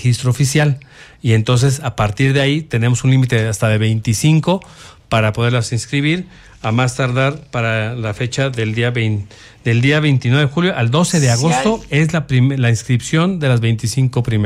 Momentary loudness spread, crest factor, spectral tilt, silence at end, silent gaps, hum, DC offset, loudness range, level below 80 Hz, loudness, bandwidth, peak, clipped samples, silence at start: 6 LU; 12 dB; -5.5 dB/octave; 0 s; none; none; under 0.1%; 3 LU; -42 dBFS; -16 LUFS; 14 kHz; -2 dBFS; under 0.1%; 0 s